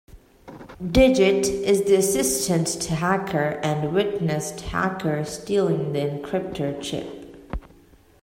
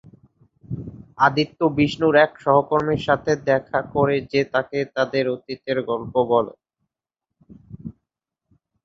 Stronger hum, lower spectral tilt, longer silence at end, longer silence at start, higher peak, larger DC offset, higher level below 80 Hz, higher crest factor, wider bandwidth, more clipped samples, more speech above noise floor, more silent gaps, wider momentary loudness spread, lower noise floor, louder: neither; second, -4.5 dB/octave vs -6.5 dB/octave; second, 0.6 s vs 0.95 s; second, 0.15 s vs 0.7 s; about the same, -4 dBFS vs -2 dBFS; neither; first, -40 dBFS vs -54 dBFS; about the same, 18 dB vs 20 dB; first, 16.5 kHz vs 7.8 kHz; neither; second, 31 dB vs 64 dB; neither; about the same, 18 LU vs 16 LU; second, -53 dBFS vs -85 dBFS; about the same, -22 LUFS vs -21 LUFS